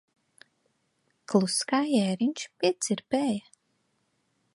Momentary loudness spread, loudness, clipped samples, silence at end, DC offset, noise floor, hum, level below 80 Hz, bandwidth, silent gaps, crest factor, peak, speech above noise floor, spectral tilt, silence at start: 5 LU; -27 LUFS; under 0.1%; 1.15 s; under 0.1%; -74 dBFS; none; -78 dBFS; 11.5 kHz; none; 22 dB; -8 dBFS; 47 dB; -4.5 dB/octave; 1.3 s